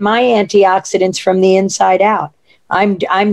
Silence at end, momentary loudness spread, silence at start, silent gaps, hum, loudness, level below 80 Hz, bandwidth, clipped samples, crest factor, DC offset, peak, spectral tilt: 0 s; 5 LU; 0 s; none; none; -12 LUFS; -58 dBFS; 11.5 kHz; under 0.1%; 12 dB; 0.2%; 0 dBFS; -4.5 dB/octave